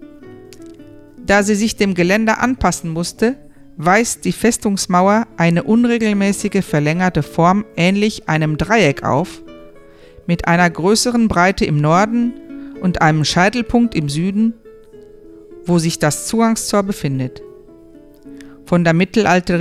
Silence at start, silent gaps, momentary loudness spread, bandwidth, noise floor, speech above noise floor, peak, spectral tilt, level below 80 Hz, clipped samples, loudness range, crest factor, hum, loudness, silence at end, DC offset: 0 s; none; 7 LU; 14.5 kHz; -42 dBFS; 27 dB; 0 dBFS; -5 dB/octave; -40 dBFS; under 0.1%; 4 LU; 16 dB; none; -15 LUFS; 0 s; under 0.1%